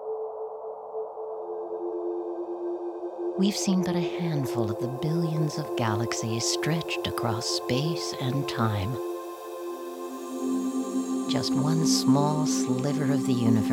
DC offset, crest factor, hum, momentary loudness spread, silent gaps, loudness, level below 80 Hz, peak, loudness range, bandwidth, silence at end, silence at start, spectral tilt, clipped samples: under 0.1%; 18 dB; none; 12 LU; none; -28 LUFS; -64 dBFS; -10 dBFS; 5 LU; 18.5 kHz; 0 s; 0 s; -5.5 dB/octave; under 0.1%